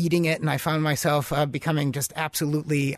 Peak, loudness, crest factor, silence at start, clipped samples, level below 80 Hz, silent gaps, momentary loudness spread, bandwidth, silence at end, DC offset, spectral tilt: -10 dBFS; -25 LUFS; 14 dB; 0 s; under 0.1%; -54 dBFS; none; 4 LU; 13.5 kHz; 0 s; under 0.1%; -5 dB/octave